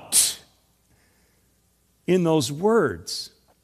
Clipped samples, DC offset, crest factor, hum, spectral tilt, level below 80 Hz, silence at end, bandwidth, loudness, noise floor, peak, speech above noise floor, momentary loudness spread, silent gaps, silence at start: under 0.1%; under 0.1%; 22 dB; none; -3.5 dB/octave; -60 dBFS; 0.35 s; 15 kHz; -22 LUFS; -65 dBFS; -4 dBFS; 43 dB; 18 LU; none; 0 s